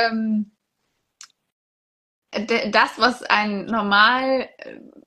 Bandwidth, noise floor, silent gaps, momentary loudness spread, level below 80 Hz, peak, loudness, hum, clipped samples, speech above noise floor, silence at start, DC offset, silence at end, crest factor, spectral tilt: 12 kHz; -74 dBFS; 1.52-2.22 s; 19 LU; -62 dBFS; 0 dBFS; -19 LUFS; none; under 0.1%; 54 dB; 0 s; under 0.1%; 0.2 s; 22 dB; -4.5 dB/octave